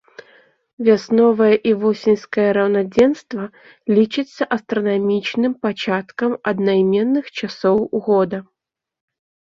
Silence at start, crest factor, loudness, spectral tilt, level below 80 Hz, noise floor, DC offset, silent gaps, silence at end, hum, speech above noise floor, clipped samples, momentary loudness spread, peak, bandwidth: 0.8 s; 16 dB; -18 LUFS; -7 dB/octave; -60 dBFS; -53 dBFS; under 0.1%; none; 1.15 s; none; 36 dB; under 0.1%; 8 LU; -2 dBFS; 7.4 kHz